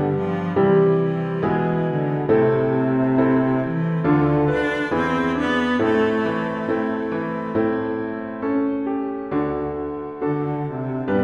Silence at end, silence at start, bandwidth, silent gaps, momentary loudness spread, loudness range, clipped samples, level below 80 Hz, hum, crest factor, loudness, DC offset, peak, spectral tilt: 0 s; 0 s; 7.8 kHz; none; 8 LU; 5 LU; under 0.1%; -48 dBFS; none; 14 dB; -21 LUFS; under 0.1%; -6 dBFS; -8.5 dB/octave